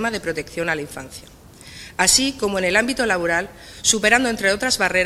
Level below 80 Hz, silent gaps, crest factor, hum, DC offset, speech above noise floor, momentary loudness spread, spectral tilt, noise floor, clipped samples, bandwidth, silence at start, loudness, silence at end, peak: -46 dBFS; none; 20 dB; none; under 0.1%; 20 dB; 19 LU; -2 dB/octave; -40 dBFS; under 0.1%; 16 kHz; 0 s; -19 LUFS; 0 s; 0 dBFS